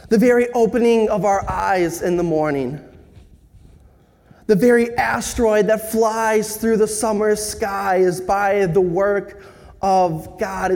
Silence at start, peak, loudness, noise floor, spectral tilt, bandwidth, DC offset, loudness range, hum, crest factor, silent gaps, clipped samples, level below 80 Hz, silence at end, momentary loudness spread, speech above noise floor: 0.05 s; -4 dBFS; -18 LUFS; -51 dBFS; -5 dB/octave; 17.5 kHz; under 0.1%; 3 LU; none; 16 dB; none; under 0.1%; -44 dBFS; 0 s; 8 LU; 33 dB